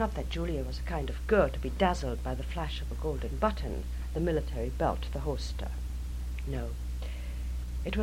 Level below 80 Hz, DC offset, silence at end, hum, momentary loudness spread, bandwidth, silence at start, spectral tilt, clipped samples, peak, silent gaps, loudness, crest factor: -36 dBFS; under 0.1%; 0 s; none; 9 LU; 15.5 kHz; 0 s; -6.5 dB/octave; under 0.1%; -12 dBFS; none; -33 LUFS; 20 dB